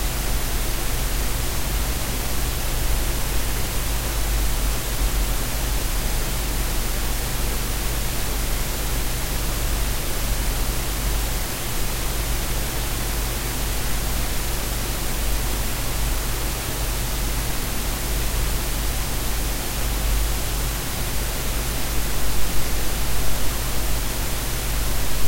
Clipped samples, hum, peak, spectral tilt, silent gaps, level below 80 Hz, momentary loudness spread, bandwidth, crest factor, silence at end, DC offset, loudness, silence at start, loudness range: under 0.1%; none; -6 dBFS; -3 dB/octave; none; -24 dBFS; 1 LU; 16 kHz; 16 dB; 0 s; under 0.1%; -25 LUFS; 0 s; 1 LU